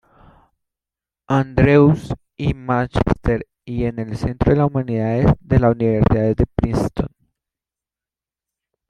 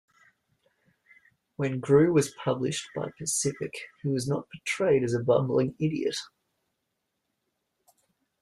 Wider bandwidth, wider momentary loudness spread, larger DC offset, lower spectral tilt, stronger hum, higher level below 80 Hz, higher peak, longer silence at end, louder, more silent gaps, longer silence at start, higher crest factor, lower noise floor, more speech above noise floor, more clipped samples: second, 10.5 kHz vs 13.5 kHz; about the same, 11 LU vs 13 LU; neither; first, -9 dB/octave vs -5 dB/octave; neither; first, -32 dBFS vs -66 dBFS; first, -2 dBFS vs -10 dBFS; second, 1.85 s vs 2.15 s; first, -18 LUFS vs -27 LUFS; neither; second, 1.3 s vs 1.6 s; about the same, 18 dB vs 20 dB; first, under -90 dBFS vs -81 dBFS; first, over 73 dB vs 54 dB; neither